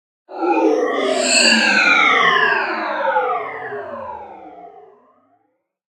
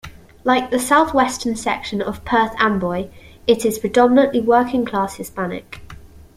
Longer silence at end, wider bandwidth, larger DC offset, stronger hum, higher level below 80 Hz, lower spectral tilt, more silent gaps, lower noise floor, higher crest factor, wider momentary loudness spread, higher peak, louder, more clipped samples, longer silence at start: first, 1.1 s vs 0.15 s; second, 13 kHz vs 16 kHz; neither; neither; second, -70 dBFS vs -46 dBFS; second, -1 dB/octave vs -4.5 dB/octave; neither; first, -68 dBFS vs -40 dBFS; about the same, 18 dB vs 18 dB; first, 18 LU vs 12 LU; about the same, 0 dBFS vs -2 dBFS; first, -15 LUFS vs -18 LUFS; neither; first, 0.3 s vs 0.05 s